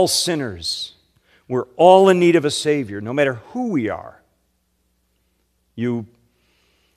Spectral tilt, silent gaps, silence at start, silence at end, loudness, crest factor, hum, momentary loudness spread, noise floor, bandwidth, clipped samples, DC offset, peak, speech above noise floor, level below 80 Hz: -4.5 dB/octave; none; 0 s; 0.9 s; -18 LUFS; 20 dB; none; 15 LU; -67 dBFS; 14.5 kHz; under 0.1%; under 0.1%; 0 dBFS; 49 dB; -60 dBFS